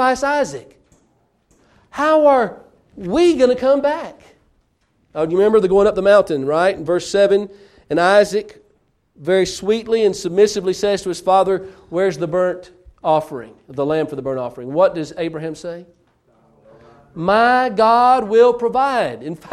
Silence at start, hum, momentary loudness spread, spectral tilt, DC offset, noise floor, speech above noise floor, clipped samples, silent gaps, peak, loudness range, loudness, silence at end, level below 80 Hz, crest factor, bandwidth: 0 s; none; 14 LU; -5 dB/octave; under 0.1%; -62 dBFS; 46 dB; under 0.1%; none; -2 dBFS; 5 LU; -16 LUFS; 0 s; -50 dBFS; 16 dB; 13 kHz